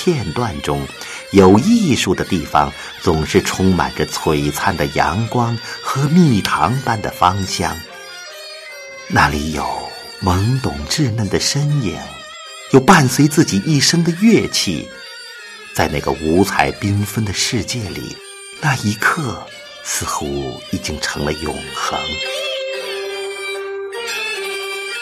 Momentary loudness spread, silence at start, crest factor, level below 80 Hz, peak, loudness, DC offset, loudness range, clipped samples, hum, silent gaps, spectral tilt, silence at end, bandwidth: 17 LU; 0 s; 18 dB; -38 dBFS; 0 dBFS; -17 LUFS; under 0.1%; 8 LU; under 0.1%; none; none; -4.5 dB/octave; 0 s; 14 kHz